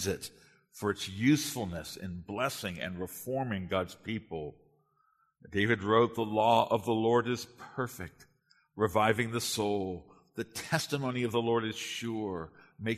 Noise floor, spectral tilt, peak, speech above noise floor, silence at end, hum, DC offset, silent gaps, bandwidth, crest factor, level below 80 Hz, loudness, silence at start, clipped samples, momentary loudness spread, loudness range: -72 dBFS; -5 dB/octave; -10 dBFS; 41 dB; 0 s; none; under 0.1%; none; 13.5 kHz; 22 dB; -64 dBFS; -32 LUFS; 0 s; under 0.1%; 15 LU; 7 LU